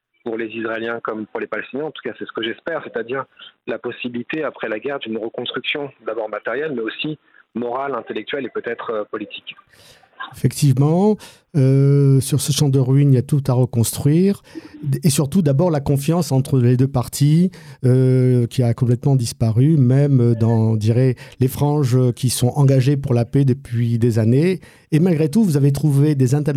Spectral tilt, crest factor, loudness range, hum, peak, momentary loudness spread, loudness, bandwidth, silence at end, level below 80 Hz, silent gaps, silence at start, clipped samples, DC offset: -6.5 dB/octave; 14 dB; 10 LU; none; -4 dBFS; 12 LU; -18 LUFS; 15.5 kHz; 0 s; -52 dBFS; none; 0.25 s; under 0.1%; under 0.1%